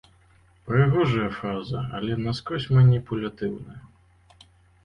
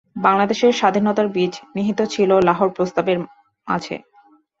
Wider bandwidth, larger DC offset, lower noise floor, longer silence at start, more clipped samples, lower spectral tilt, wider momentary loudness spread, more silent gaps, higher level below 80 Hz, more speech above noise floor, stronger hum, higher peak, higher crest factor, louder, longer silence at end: second, 6.6 kHz vs 7.8 kHz; neither; first, -58 dBFS vs -54 dBFS; first, 0.65 s vs 0.15 s; neither; first, -8.5 dB/octave vs -5.5 dB/octave; first, 13 LU vs 9 LU; neither; first, -50 dBFS vs -58 dBFS; about the same, 35 dB vs 36 dB; neither; second, -8 dBFS vs -2 dBFS; about the same, 18 dB vs 18 dB; second, -24 LUFS vs -19 LUFS; first, 1 s vs 0.6 s